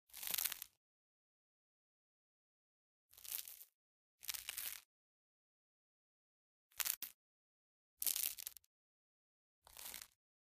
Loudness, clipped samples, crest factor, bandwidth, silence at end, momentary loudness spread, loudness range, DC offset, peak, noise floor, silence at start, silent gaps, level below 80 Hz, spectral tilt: -43 LUFS; under 0.1%; 38 dB; 16 kHz; 0.4 s; 18 LU; 9 LU; under 0.1%; -14 dBFS; under -90 dBFS; 0.1 s; 0.77-3.09 s, 3.74-4.19 s, 4.85-6.71 s, 6.97-7.01 s, 7.14-7.97 s, 8.66-9.62 s; -84 dBFS; 2.5 dB/octave